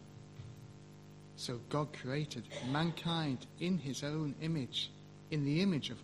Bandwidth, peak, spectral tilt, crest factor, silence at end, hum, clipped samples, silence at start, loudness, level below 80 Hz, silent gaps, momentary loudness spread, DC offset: 12.5 kHz; -20 dBFS; -5.5 dB/octave; 18 dB; 0 s; 50 Hz at -55 dBFS; under 0.1%; 0 s; -38 LUFS; -68 dBFS; none; 20 LU; under 0.1%